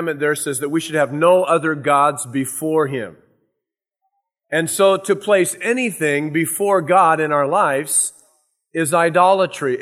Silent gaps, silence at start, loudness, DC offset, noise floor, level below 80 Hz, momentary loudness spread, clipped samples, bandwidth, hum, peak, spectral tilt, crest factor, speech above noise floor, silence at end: none; 0 s; -17 LUFS; under 0.1%; -81 dBFS; -72 dBFS; 9 LU; under 0.1%; 15.5 kHz; none; -2 dBFS; -4 dB/octave; 16 dB; 64 dB; 0 s